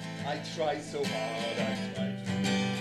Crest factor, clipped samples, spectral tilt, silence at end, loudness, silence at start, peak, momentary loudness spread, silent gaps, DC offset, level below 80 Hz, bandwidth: 14 dB; under 0.1%; -5 dB/octave; 0 s; -33 LUFS; 0 s; -18 dBFS; 6 LU; none; under 0.1%; -66 dBFS; 13 kHz